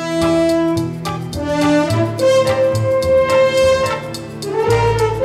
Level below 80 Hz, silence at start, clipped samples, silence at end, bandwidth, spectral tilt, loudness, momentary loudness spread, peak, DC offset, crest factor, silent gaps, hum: -38 dBFS; 0 s; under 0.1%; 0 s; 15 kHz; -6 dB/octave; -15 LUFS; 10 LU; -2 dBFS; under 0.1%; 14 dB; none; none